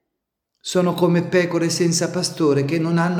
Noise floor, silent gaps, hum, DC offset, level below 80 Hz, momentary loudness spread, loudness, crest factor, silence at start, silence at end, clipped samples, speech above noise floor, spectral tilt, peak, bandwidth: -80 dBFS; none; none; under 0.1%; -64 dBFS; 4 LU; -19 LUFS; 16 dB; 0.65 s; 0 s; under 0.1%; 61 dB; -5 dB/octave; -4 dBFS; 15.5 kHz